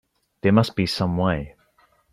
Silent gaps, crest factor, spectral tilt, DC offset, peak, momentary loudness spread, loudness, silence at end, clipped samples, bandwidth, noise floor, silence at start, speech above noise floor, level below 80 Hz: none; 18 dB; -7 dB/octave; under 0.1%; -4 dBFS; 9 LU; -22 LUFS; 0.65 s; under 0.1%; 14.5 kHz; -61 dBFS; 0.45 s; 41 dB; -48 dBFS